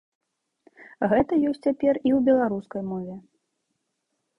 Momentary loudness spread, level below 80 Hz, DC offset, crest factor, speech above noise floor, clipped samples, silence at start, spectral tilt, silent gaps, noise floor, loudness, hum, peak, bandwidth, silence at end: 13 LU; -58 dBFS; under 0.1%; 16 dB; 55 dB; under 0.1%; 0.8 s; -9 dB/octave; none; -78 dBFS; -24 LUFS; none; -8 dBFS; 10 kHz; 1.2 s